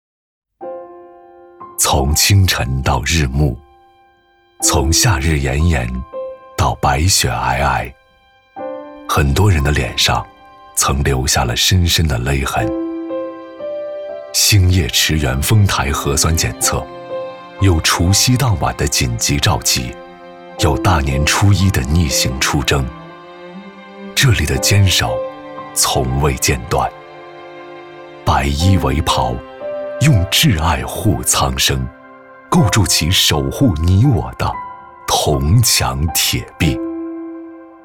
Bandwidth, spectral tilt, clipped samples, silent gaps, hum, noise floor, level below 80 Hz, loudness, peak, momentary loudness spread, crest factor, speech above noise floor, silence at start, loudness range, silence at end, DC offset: 18 kHz; -4 dB/octave; under 0.1%; none; none; -53 dBFS; -26 dBFS; -15 LUFS; -2 dBFS; 18 LU; 14 dB; 39 dB; 0.6 s; 3 LU; 0.15 s; under 0.1%